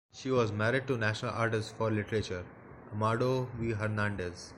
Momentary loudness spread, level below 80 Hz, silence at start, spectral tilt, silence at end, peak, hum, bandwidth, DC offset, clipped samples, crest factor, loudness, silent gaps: 10 LU; -58 dBFS; 0.15 s; -6 dB/octave; 0 s; -14 dBFS; none; 11 kHz; under 0.1%; under 0.1%; 18 dB; -32 LUFS; none